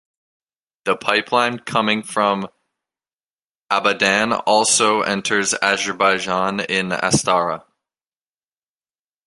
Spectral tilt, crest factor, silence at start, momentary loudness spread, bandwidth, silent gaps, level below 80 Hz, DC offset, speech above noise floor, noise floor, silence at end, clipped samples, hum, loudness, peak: -2.5 dB/octave; 20 dB; 0.85 s; 7 LU; 11.5 kHz; 3.14-3.34 s, 3.44-3.65 s; -58 dBFS; under 0.1%; over 72 dB; under -90 dBFS; 1.7 s; under 0.1%; none; -18 LUFS; 0 dBFS